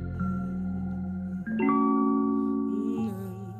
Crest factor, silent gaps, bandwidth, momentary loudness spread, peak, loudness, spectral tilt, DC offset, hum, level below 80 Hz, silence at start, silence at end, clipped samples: 14 dB; none; 13 kHz; 9 LU; -14 dBFS; -28 LUFS; -10 dB/octave; under 0.1%; none; -54 dBFS; 0 s; 0 s; under 0.1%